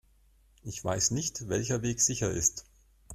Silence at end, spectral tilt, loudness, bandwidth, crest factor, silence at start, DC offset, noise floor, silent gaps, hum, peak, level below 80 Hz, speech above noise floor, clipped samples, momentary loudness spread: 0 s; -3.5 dB/octave; -29 LUFS; 15.5 kHz; 20 dB; 0.65 s; under 0.1%; -63 dBFS; none; none; -12 dBFS; -54 dBFS; 33 dB; under 0.1%; 14 LU